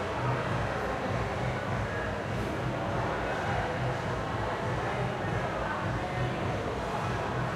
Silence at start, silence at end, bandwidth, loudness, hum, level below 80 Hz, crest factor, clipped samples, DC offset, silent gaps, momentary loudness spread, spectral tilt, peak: 0 s; 0 s; 13.5 kHz; -32 LUFS; none; -46 dBFS; 14 dB; under 0.1%; under 0.1%; none; 2 LU; -6.5 dB/octave; -18 dBFS